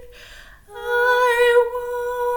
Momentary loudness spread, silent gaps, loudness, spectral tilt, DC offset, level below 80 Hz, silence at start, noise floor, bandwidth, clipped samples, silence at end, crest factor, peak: 10 LU; none; -18 LUFS; -1 dB/octave; under 0.1%; -50 dBFS; 0 s; -43 dBFS; 19 kHz; under 0.1%; 0 s; 14 dB; -6 dBFS